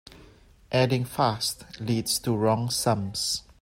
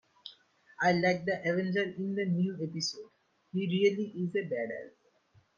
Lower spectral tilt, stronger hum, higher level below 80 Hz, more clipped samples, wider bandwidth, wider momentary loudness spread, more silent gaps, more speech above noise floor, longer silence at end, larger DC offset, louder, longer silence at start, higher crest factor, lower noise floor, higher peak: about the same, -4.5 dB/octave vs -5.5 dB/octave; neither; first, -56 dBFS vs -76 dBFS; neither; first, 16 kHz vs 7.4 kHz; second, 5 LU vs 18 LU; neither; second, 28 dB vs 36 dB; second, 0.2 s vs 0.7 s; neither; first, -26 LUFS vs -31 LUFS; about the same, 0.15 s vs 0.25 s; about the same, 18 dB vs 18 dB; second, -54 dBFS vs -67 dBFS; first, -8 dBFS vs -14 dBFS